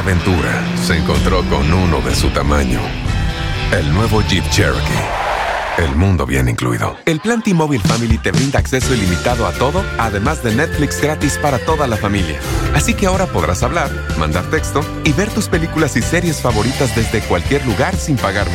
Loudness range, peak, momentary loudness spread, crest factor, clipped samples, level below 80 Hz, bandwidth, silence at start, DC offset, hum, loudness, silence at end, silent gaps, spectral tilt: 1 LU; -2 dBFS; 3 LU; 12 dB; under 0.1%; -24 dBFS; 16.5 kHz; 0 s; under 0.1%; none; -16 LUFS; 0 s; none; -5 dB/octave